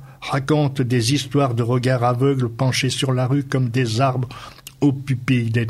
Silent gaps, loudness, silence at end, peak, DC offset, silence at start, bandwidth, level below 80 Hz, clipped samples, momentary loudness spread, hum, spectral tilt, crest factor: none; -20 LUFS; 0 s; -4 dBFS; under 0.1%; 0 s; 13 kHz; -52 dBFS; under 0.1%; 6 LU; none; -6 dB/octave; 16 dB